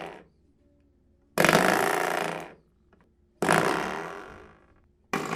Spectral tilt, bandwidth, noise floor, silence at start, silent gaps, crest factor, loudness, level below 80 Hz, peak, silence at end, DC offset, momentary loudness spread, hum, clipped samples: -4 dB/octave; 16 kHz; -63 dBFS; 0 s; none; 28 dB; -25 LUFS; -60 dBFS; -2 dBFS; 0 s; under 0.1%; 22 LU; none; under 0.1%